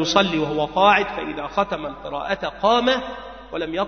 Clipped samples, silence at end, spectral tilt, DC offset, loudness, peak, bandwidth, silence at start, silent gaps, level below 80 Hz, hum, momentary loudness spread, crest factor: under 0.1%; 0 s; -4 dB/octave; 0.2%; -21 LUFS; 0 dBFS; 6.6 kHz; 0 s; none; -48 dBFS; none; 13 LU; 20 dB